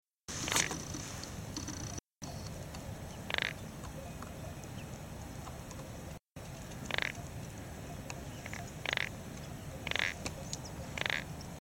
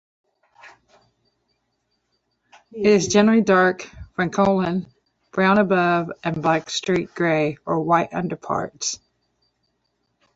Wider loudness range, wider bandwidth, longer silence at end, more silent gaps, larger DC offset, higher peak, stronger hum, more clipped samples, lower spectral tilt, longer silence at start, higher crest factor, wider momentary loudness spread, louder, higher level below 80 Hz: about the same, 5 LU vs 5 LU; first, 17 kHz vs 8 kHz; second, 0 s vs 1.4 s; neither; neither; second, -14 dBFS vs -4 dBFS; neither; neither; second, -3 dB/octave vs -5 dB/octave; second, 0.3 s vs 0.65 s; first, 28 dB vs 18 dB; about the same, 12 LU vs 11 LU; second, -40 LUFS vs -20 LUFS; about the same, -54 dBFS vs -56 dBFS